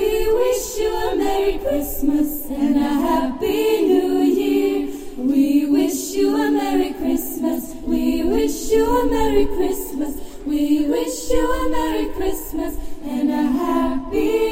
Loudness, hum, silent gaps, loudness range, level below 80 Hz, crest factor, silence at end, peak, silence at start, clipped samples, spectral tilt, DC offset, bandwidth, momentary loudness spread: -20 LUFS; none; none; 3 LU; -32 dBFS; 16 dB; 0 s; -4 dBFS; 0 s; under 0.1%; -4.5 dB/octave; under 0.1%; 16.5 kHz; 8 LU